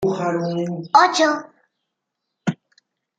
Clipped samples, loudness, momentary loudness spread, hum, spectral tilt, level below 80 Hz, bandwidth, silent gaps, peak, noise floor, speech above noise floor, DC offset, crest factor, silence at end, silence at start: under 0.1%; -19 LUFS; 13 LU; none; -4.5 dB/octave; -64 dBFS; 9.4 kHz; none; -2 dBFS; -79 dBFS; 61 dB; under 0.1%; 20 dB; 0.65 s; 0 s